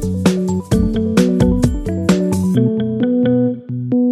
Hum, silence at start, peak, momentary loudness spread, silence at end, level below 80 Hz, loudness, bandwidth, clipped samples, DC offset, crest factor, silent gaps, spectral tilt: none; 0 s; 0 dBFS; 5 LU; 0 s; -30 dBFS; -16 LUFS; 14 kHz; under 0.1%; under 0.1%; 14 dB; none; -7.5 dB/octave